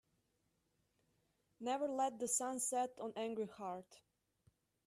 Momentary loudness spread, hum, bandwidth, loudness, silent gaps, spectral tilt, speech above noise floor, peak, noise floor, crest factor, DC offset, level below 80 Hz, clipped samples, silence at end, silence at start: 11 LU; none; 14.5 kHz; -41 LUFS; none; -2.5 dB/octave; 41 dB; -24 dBFS; -83 dBFS; 20 dB; under 0.1%; -86 dBFS; under 0.1%; 0.9 s; 1.6 s